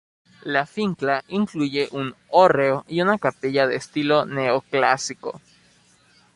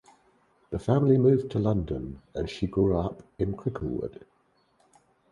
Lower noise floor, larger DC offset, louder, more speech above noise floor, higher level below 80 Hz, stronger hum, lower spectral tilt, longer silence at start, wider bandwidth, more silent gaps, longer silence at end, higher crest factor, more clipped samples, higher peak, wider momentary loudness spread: second, -57 dBFS vs -68 dBFS; neither; first, -21 LUFS vs -27 LUFS; second, 36 dB vs 41 dB; second, -64 dBFS vs -46 dBFS; neither; second, -5 dB/octave vs -9 dB/octave; second, 0.45 s vs 0.7 s; about the same, 11.5 kHz vs 10.5 kHz; neither; second, 1 s vs 1.2 s; about the same, 20 dB vs 20 dB; neither; first, -2 dBFS vs -8 dBFS; about the same, 12 LU vs 14 LU